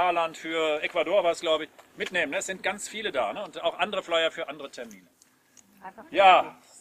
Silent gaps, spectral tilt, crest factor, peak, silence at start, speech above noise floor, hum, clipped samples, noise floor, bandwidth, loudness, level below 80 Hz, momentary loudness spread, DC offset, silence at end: none; -2 dB/octave; 22 dB; -4 dBFS; 0 s; 33 dB; none; under 0.1%; -60 dBFS; 15.5 kHz; -26 LUFS; -70 dBFS; 20 LU; under 0.1%; 0.25 s